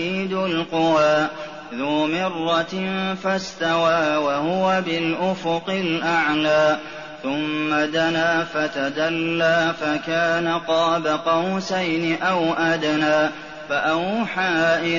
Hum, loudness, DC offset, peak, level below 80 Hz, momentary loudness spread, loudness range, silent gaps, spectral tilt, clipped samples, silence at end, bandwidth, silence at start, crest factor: none; -21 LUFS; 0.3%; -8 dBFS; -60 dBFS; 6 LU; 1 LU; none; -3 dB/octave; under 0.1%; 0 s; 7.2 kHz; 0 s; 14 dB